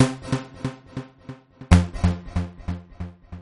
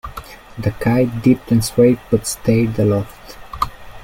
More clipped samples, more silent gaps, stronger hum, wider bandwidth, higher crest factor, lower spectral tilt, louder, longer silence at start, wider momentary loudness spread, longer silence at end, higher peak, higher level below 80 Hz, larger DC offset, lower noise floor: neither; neither; neither; second, 11.5 kHz vs 16.5 kHz; first, 22 dB vs 16 dB; about the same, -6.5 dB/octave vs -6.5 dB/octave; second, -24 LUFS vs -17 LUFS; about the same, 0 s vs 0.05 s; first, 22 LU vs 18 LU; about the same, 0 s vs 0 s; about the same, -2 dBFS vs -2 dBFS; first, -32 dBFS vs -38 dBFS; neither; first, -43 dBFS vs -35 dBFS